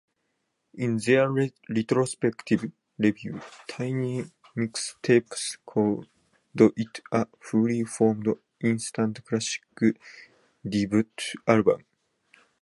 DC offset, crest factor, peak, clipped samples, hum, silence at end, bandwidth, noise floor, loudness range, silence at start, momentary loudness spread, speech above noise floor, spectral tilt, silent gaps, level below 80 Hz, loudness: under 0.1%; 24 dB; -4 dBFS; under 0.1%; none; 0.85 s; 11.5 kHz; -77 dBFS; 3 LU; 0.75 s; 12 LU; 51 dB; -5.5 dB/octave; none; -64 dBFS; -26 LUFS